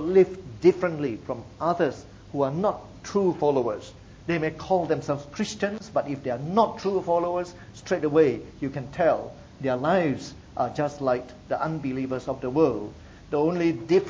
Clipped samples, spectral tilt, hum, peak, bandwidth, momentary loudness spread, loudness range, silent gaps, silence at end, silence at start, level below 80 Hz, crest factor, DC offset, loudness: under 0.1%; -6.5 dB/octave; none; -6 dBFS; 7.8 kHz; 12 LU; 2 LU; none; 0 s; 0 s; -54 dBFS; 18 dB; under 0.1%; -26 LUFS